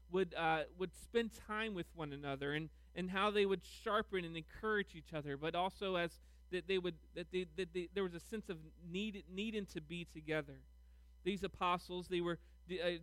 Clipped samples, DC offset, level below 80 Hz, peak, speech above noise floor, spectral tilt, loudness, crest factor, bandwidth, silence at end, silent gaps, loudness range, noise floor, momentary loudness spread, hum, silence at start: under 0.1%; under 0.1%; -62 dBFS; -22 dBFS; 21 dB; -5.5 dB/octave; -42 LUFS; 18 dB; 15.5 kHz; 0 s; none; 5 LU; -62 dBFS; 10 LU; none; 0 s